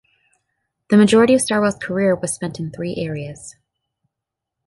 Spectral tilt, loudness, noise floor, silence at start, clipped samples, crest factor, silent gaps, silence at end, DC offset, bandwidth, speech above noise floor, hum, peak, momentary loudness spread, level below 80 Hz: -5 dB/octave; -17 LUFS; -83 dBFS; 0.9 s; under 0.1%; 18 dB; none; 1.15 s; under 0.1%; 11.5 kHz; 66 dB; none; -2 dBFS; 15 LU; -54 dBFS